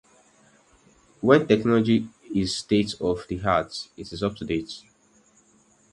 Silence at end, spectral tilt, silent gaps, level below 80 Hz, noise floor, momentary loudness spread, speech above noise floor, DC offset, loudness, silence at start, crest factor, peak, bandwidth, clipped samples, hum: 1.15 s; -6 dB/octave; none; -52 dBFS; -60 dBFS; 15 LU; 37 dB; under 0.1%; -24 LUFS; 1.2 s; 22 dB; -4 dBFS; 11.5 kHz; under 0.1%; none